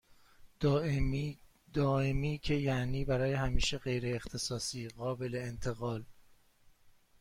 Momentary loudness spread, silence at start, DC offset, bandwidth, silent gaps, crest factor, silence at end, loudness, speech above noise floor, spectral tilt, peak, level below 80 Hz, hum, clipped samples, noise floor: 8 LU; 0.4 s; under 0.1%; 15.5 kHz; none; 18 dB; 0.3 s; -35 LUFS; 31 dB; -5.5 dB/octave; -16 dBFS; -44 dBFS; none; under 0.1%; -64 dBFS